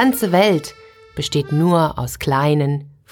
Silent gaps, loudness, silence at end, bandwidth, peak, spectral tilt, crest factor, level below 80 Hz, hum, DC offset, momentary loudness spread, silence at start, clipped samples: none; -18 LUFS; 0.25 s; 19.5 kHz; -2 dBFS; -6 dB/octave; 16 dB; -46 dBFS; none; under 0.1%; 11 LU; 0 s; under 0.1%